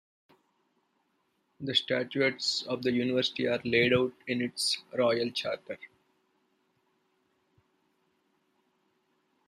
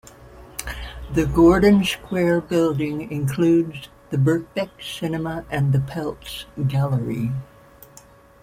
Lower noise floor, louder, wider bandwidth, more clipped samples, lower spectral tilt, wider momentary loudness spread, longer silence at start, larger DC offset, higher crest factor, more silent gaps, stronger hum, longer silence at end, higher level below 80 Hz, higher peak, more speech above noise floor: first, -75 dBFS vs -48 dBFS; second, -29 LUFS vs -21 LUFS; second, 14 kHz vs 16 kHz; neither; second, -4 dB/octave vs -7 dB/octave; second, 9 LU vs 16 LU; first, 1.6 s vs 0.2 s; neither; about the same, 22 dB vs 18 dB; neither; neither; first, 3.6 s vs 1 s; second, -72 dBFS vs -40 dBFS; second, -12 dBFS vs -4 dBFS; first, 46 dB vs 28 dB